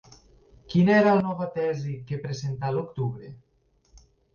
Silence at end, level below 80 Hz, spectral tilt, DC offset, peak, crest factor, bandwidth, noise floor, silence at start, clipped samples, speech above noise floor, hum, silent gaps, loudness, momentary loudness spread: 0.35 s; -58 dBFS; -7.5 dB/octave; under 0.1%; -10 dBFS; 18 dB; 7 kHz; -61 dBFS; 0.7 s; under 0.1%; 36 dB; none; none; -25 LUFS; 14 LU